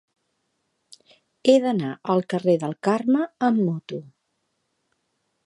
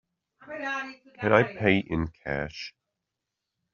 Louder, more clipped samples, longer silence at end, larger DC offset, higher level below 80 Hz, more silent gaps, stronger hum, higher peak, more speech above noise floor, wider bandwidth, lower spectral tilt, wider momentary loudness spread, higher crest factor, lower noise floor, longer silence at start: first, -22 LUFS vs -27 LUFS; neither; first, 1.45 s vs 1.05 s; neither; second, -74 dBFS vs -52 dBFS; neither; neither; about the same, -4 dBFS vs -4 dBFS; second, 53 dB vs 58 dB; first, 11.5 kHz vs 7 kHz; first, -7 dB/octave vs -4.5 dB/octave; second, 9 LU vs 18 LU; second, 20 dB vs 26 dB; second, -74 dBFS vs -85 dBFS; first, 1.45 s vs 0.45 s